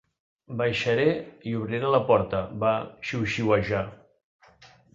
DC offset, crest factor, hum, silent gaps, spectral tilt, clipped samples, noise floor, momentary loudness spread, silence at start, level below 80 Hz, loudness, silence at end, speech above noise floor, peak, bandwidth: under 0.1%; 20 dB; none; 4.24-4.39 s; -6.5 dB/octave; under 0.1%; -55 dBFS; 9 LU; 0.5 s; -54 dBFS; -26 LUFS; 0.3 s; 30 dB; -8 dBFS; 7.8 kHz